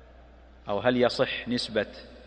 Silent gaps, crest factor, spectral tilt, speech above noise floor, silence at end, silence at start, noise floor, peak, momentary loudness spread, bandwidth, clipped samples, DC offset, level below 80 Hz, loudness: none; 20 dB; -5 dB/octave; 24 dB; 0 s; 0.1 s; -51 dBFS; -8 dBFS; 11 LU; 9.8 kHz; under 0.1%; under 0.1%; -54 dBFS; -27 LUFS